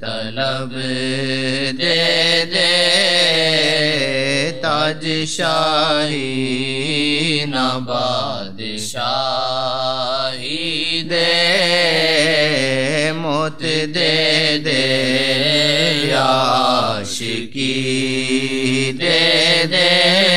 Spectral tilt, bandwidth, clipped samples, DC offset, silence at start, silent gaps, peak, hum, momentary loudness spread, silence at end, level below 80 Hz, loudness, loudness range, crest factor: -3.5 dB/octave; 15 kHz; under 0.1%; 2%; 0 s; none; 0 dBFS; none; 8 LU; 0 s; -60 dBFS; -16 LUFS; 5 LU; 16 dB